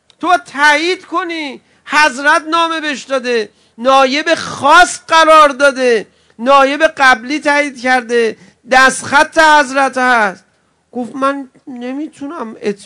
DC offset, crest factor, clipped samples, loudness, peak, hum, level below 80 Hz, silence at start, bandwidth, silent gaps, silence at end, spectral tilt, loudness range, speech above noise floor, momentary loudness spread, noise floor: under 0.1%; 12 dB; 1%; -11 LUFS; 0 dBFS; none; -48 dBFS; 0.2 s; 12 kHz; none; 0 s; -2 dB/octave; 4 LU; 38 dB; 16 LU; -50 dBFS